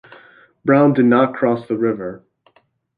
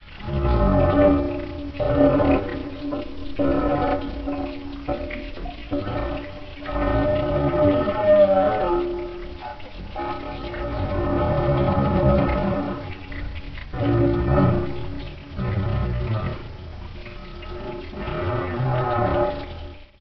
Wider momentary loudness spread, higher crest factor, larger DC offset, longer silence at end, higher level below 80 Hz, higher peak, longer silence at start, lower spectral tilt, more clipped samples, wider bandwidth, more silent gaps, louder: second, 13 LU vs 17 LU; about the same, 16 dB vs 18 dB; second, under 0.1% vs 0.4%; first, 0.8 s vs 0 s; second, -62 dBFS vs -32 dBFS; about the same, -2 dBFS vs -4 dBFS; first, 0.65 s vs 0 s; first, -10.5 dB/octave vs -7 dB/octave; neither; second, 4.8 kHz vs 6 kHz; neither; first, -16 LUFS vs -23 LUFS